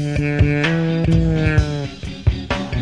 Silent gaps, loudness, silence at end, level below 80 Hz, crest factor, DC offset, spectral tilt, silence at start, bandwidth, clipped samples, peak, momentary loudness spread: none; -19 LUFS; 0 s; -26 dBFS; 16 dB; 0.5%; -7 dB/octave; 0 s; 10 kHz; under 0.1%; -2 dBFS; 7 LU